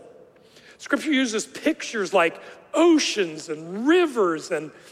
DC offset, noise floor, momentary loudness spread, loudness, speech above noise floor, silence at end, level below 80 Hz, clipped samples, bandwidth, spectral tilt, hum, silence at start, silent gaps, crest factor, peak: under 0.1%; -51 dBFS; 12 LU; -23 LUFS; 29 dB; 0.2 s; -72 dBFS; under 0.1%; 13.5 kHz; -3 dB/octave; none; 0.05 s; none; 16 dB; -6 dBFS